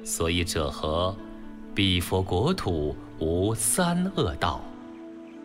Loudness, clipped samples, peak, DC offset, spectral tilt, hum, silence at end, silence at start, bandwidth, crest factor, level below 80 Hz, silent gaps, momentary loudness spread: -26 LUFS; under 0.1%; -10 dBFS; under 0.1%; -4.5 dB/octave; none; 0 s; 0 s; 16 kHz; 16 dB; -42 dBFS; none; 19 LU